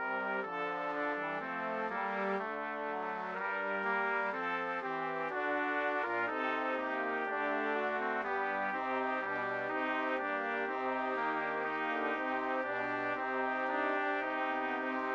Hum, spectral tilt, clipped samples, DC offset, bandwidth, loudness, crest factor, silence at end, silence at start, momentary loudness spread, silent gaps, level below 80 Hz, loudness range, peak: none; -6 dB/octave; under 0.1%; under 0.1%; 7.8 kHz; -35 LUFS; 14 dB; 0 s; 0 s; 3 LU; none; -74 dBFS; 2 LU; -20 dBFS